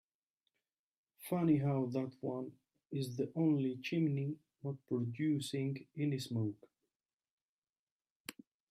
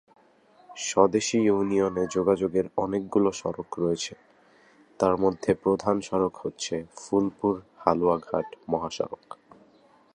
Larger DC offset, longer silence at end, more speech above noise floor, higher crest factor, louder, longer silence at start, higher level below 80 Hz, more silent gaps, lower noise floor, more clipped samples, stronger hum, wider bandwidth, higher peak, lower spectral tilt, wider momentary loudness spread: neither; second, 0.4 s vs 0.8 s; first, over 54 dB vs 33 dB; about the same, 18 dB vs 22 dB; second, -38 LUFS vs -26 LUFS; first, 1.2 s vs 0.7 s; second, -80 dBFS vs -58 dBFS; first, 6.96-7.20 s, 7.31-7.62 s, 7.69-8.00 s, 8.10-8.25 s vs none; first, under -90 dBFS vs -59 dBFS; neither; neither; first, 15 kHz vs 10.5 kHz; second, -20 dBFS vs -4 dBFS; first, -7 dB/octave vs -5 dB/octave; first, 17 LU vs 10 LU